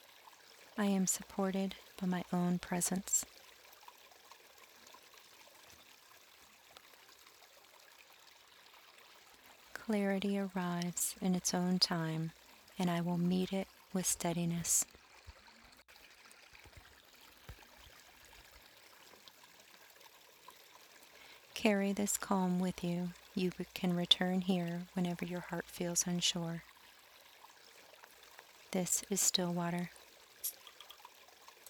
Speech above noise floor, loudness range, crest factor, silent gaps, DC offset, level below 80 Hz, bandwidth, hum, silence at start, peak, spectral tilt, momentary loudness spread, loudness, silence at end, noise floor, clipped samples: 26 dB; 23 LU; 28 dB; none; under 0.1%; -70 dBFS; 19.5 kHz; none; 0.3 s; -12 dBFS; -3.5 dB/octave; 26 LU; -36 LUFS; 0.2 s; -62 dBFS; under 0.1%